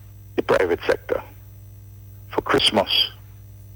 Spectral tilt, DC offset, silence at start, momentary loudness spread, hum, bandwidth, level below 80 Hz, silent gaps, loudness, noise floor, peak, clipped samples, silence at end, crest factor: -3.5 dB/octave; under 0.1%; 0 s; 12 LU; 50 Hz at -45 dBFS; over 20 kHz; -48 dBFS; none; -21 LUFS; -42 dBFS; -6 dBFS; under 0.1%; 0 s; 18 dB